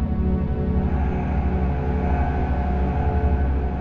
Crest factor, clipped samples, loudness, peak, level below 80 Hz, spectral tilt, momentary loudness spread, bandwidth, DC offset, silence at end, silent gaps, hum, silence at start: 12 dB; under 0.1%; -23 LUFS; -8 dBFS; -24 dBFS; -10.5 dB/octave; 2 LU; 4.2 kHz; under 0.1%; 0 s; none; none; 0 s